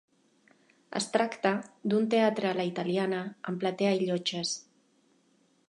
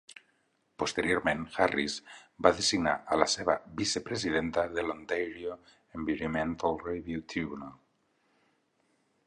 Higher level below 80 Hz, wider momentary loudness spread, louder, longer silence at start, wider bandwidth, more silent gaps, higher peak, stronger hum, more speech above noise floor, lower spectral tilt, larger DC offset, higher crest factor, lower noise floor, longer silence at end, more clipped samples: second, -82 dBFS vs -58 dBFS; second, 9 LU vs 13 LU; about the same, -30 LUFS vs -31 LUFS; about the same, 0.9 s vs 0.8 s; about the same, 11 kHz vs 11.5 kHz; neither; second, -10 dBFS vs -6 dBFS; neither; about the same, 39 dB vs 42 dB; about the same, -4.5 dB/octave vs -3.5 dB/octave; neither; second, 20 dB vs 26 dB; second, -68 dBFS vs -73 dBFS; second, 1.05 s vs 1.55 s; neither